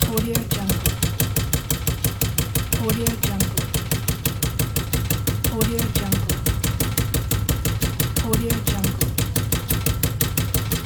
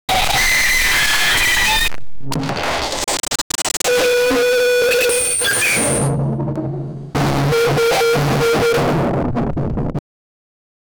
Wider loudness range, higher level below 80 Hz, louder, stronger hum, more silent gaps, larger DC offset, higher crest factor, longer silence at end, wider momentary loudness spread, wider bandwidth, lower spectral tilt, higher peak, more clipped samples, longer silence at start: about the same, 1 LU vs 2 LU; about the same, -30 dBFS vs -32 dBFS; second, -22 LUFS vs -15 LUFS; neither; second, none vs 3.41-3.50 s; neither; first, 20 dB vs 10 dB; second, 0 s vs 1 s; second, 2 LU vs 10 LU; about the same, over 20 kHz vs over 20 kHz; first, -4.5 dB/octave vs -3 dB/octave; first, -2 dBFS vs -6 dBFS; neither; about the same, 0 s vs 0.1 s